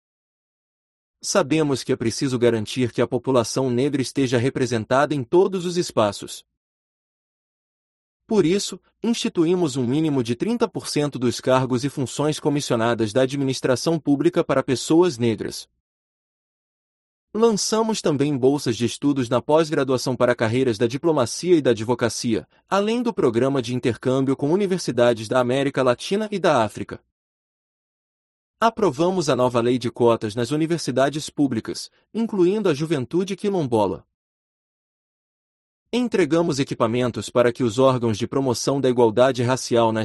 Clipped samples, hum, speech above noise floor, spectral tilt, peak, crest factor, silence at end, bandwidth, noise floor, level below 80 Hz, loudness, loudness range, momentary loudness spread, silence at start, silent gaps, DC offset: under 0.1%; none; over 69 dB; -5.5 dB/octave; -4 dBFS; 18 dB; 0 s; 12 kHz; under -90 dBFS; -58 dBFS; -21 LUFS; 4 LU; 5 LU; 1.25 s; 6.57-8.20 s, 15.80-17.28 s, 27.12-28.54 s, 34.14-35.86 s; under 0.1%